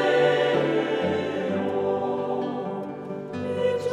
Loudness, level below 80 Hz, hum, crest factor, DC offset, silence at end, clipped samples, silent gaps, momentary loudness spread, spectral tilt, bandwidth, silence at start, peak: -25 LUFS; -68 dBFS; none; 16 dB; under 0.1%; 0 s; under 0.1%; none; 12 LU; -6.5 dB/octave; 10.5 kHz; 0 s; -10 dBFS